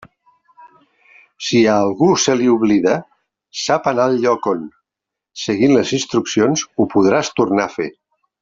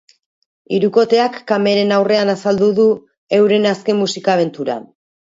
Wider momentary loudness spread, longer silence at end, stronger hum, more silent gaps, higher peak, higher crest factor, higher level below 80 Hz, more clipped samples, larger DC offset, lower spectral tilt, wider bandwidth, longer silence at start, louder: first, 12 LU vs 8 LU; about the same, 0.5 s vs 0.55 s; neither; second, none vs 3.18-3.27 s; about the same, -2 dBFS vs 0 dBFS; about the same, 16 dB vs 14 dB; first, -56 dBFS vs -62 dBFS; neither; neither; about the same, -4.5 dB/octave vs -5.5 dB/octave; about the same, 7.8 kHz vs 7.8 kHz; about the same, 0.65 s vs 0.7 s; about the same, -16 LUFS vs -15 LUFS